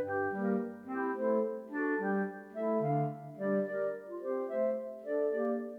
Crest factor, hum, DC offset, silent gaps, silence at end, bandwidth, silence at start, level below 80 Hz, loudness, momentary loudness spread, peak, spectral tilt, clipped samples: 14 dB; none; under 0.1%; none; 0 s; 4.7 kHz; 0 s; -84 dBFS; -34 LUFS; 6 LU; -20 dBFS; -10 dB/octave; under 0.1%